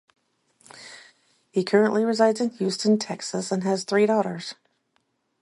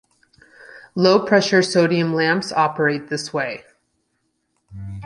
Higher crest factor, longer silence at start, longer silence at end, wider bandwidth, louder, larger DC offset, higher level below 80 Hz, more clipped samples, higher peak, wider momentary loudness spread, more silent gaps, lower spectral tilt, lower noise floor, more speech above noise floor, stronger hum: about the same, 20 dB vs 18 dB; about the same, 0.75 s vs 0.75 s; first, 0.9 s vs 0 s; about the same, 11.5 kHz vs 11.5 kHz; second, -23 LUFS vs -18 LUFS; neither; second, -74 dBFS vs -54 dBFS; neither; second, -6 dBFS vs -2 dBFS; first, 19 LU vs 15 LU; neither; about the same, -5 dB/octave vs -5 dB/octave; about the same, -71 dBFS vs -71 dBFS; second, 49 dB vs 53 dB; neither